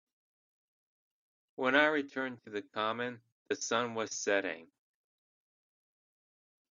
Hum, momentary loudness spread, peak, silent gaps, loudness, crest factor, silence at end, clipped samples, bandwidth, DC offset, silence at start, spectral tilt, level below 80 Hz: none; 15 LU; -10 dBFS; 3.32-3.46 s; -33 LUFS; 26 dB; 2.05 s; under 0.1%; 7.4 kHz; under 0.1%; 1.6 s; -1.5 dB/octave; -84 dBFS